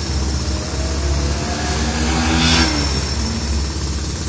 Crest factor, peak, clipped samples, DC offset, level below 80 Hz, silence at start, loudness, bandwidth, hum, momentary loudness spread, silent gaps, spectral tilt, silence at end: 16 dB; -2 dBFS; under 0.1%; under 0.1%; -22 dBFS; 0 s; -18 LUFS; 8 kHz; none; 8 LU; none; -4 dB/octave; 0 s